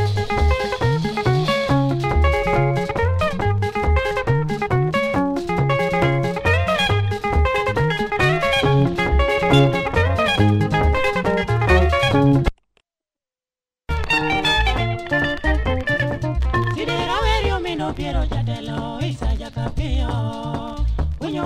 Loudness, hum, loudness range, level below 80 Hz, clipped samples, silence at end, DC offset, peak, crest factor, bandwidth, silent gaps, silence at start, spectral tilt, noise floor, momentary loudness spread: -19 LUFS; none; 5 LU; -26 dBFS; under 0.1%; 0 s; under 0.1%; -2 dBFS; 16 dB; 14 kHz; none; 0 s; -6.5 dB/octave; under -90 dBFS; 8 LU